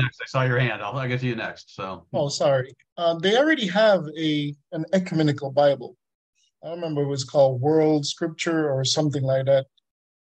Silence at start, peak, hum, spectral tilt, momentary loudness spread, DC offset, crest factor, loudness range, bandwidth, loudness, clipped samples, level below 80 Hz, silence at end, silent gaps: 0 s; -8 dBFS; none; -5.5 dB/octave; 13 LU; under 0.1%; 16 dB; 3 LU; 9 kHz; -23 LUFS; under 0.1%; -66 dBFS; 0.6 s; 2.92-2.96 s, 6.15-6.33 s